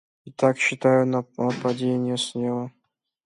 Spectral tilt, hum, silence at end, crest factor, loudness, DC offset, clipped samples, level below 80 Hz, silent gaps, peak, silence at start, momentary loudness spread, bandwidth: -5.5 dB/octave; none; 0.55 s; 18 dB; -23 LUFS; under 0.1%; under 0.1%; -68 dBFS; none; -6 dBFS; 0.25 s; 10 LU; 11.5 kHz